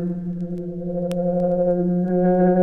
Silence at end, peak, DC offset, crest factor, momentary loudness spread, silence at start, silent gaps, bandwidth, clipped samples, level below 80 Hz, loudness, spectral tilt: 0 s; -8 dBFS; under 0.1%; 12 dB; 11 LU; 0 s; none; 5.8 kHz; under 0.1%; -48 dBFS; -22 LUFS; -10.5 dB/octave